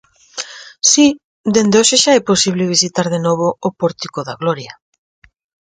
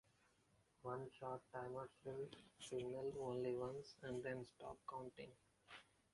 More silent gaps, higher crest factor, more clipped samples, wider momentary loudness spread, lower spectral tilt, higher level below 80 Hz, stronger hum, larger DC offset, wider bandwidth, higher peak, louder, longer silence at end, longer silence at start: first, 1.24-1.44 s vs none; about the same, 16 dB vs 18 dB; neither; first, 17 LU vs 14 LU; second, -3 dB/octave vs -6 dB/octave; first, -56 dBFS vs -78 dBFS; neither; neither; second, 10 kHz vs 11.5 kHz; first, 0 dBFS vs -34 dBFS; first, -14 LUFS vs -51 LUFS; first, 1.05 s vs 0.3 s; second, 0.35 s vs 0.85 s